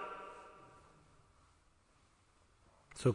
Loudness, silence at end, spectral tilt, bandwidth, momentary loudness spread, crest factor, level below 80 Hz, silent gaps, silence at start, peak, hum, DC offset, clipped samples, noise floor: -45 LUFS; 0 s; -7 dB/octave; 10.5 kHz; 24 LU; 24 dB; -72 dBFS; none; 0 s; -20 dBFS; none; under 0.1%; under 0.1%; -70 dBFS